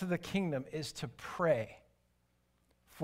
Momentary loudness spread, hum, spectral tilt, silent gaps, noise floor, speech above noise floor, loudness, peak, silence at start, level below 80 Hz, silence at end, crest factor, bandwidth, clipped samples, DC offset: 11 LU; 60 Hz at -65 dBFS; -6 dB/octave; none; -75 dBFS; 39 dB; -37 LUFS; -18 dBFS; 0 s; -68 dBFS; 0 s; 20 dB; 16 kHz; under 0.1%; under 0.1%